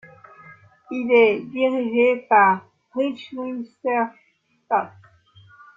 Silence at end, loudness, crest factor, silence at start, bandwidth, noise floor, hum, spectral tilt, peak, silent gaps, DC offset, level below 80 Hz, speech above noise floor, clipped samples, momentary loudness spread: 0.9 s; -21 LUFS; 18 dB; 0.5 s; 5.2 kHz; -52 dBFS; none; -7 dB/octave; -4 dBFS; none; under 0.1%; -68 dBFS; 32 dB; under 0.1%; 15 LU